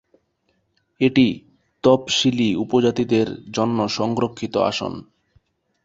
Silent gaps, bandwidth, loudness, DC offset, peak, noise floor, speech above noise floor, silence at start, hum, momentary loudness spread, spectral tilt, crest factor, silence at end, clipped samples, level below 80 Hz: none; 7.8 kHz; -20 LUFS; under 0.1%; -2 dBFS; -68 dBFS; 49 dB; 1 s; none; 8 LU; -5 dB/octave; 20 dB; 0.85 s; under 0.1%; -56 dBFS